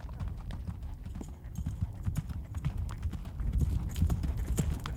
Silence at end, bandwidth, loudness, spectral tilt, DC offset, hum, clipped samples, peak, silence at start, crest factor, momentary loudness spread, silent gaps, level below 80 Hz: 0 s; 17 kHz; -37 LUFS; -6.5 dB/octave; under 0.1%; none; under 0.1%; -16 dBFS; 0 s; 18 dB; 11 LU; none; -38 dBFS